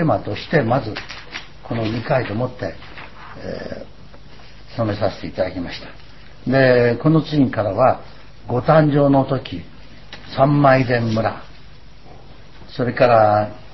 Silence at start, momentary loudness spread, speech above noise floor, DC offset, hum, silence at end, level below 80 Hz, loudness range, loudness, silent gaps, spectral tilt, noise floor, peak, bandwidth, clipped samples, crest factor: 0 s; 20 LU; 26 dB; 1%; none; 0.1 s; -44 dBFS; 10 LU; -18 LUFS; none; -8.5 dB/octave; -44 dBFS; 0 dBFS; 6 kHz; under 0.1%; 18 dB